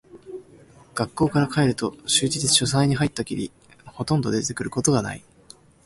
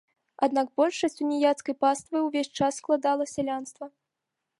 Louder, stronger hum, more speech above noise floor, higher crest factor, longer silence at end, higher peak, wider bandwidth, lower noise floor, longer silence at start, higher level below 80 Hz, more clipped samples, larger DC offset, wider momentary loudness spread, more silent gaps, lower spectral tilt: first, -22 LUFS vs -27 LUFS; neither; second, 28 dB vs 58 dB; about the same, 20 dB vs 18 dB; about the same, 0.65 s vs 0.7 s; first, -4 dBFS vs -10 dBFS; about the same, 11.5 kHz vs 11.5 kHz; second, -51 dBFS vs -85 dBFS; second, 0.15 s vs 0.4 s; first, -52 dBFS vs -72 dBFS; neither; neither; first, 18 LU vs 8 LU; neither; about the same, -4 dB/octave vs -4 dB/octave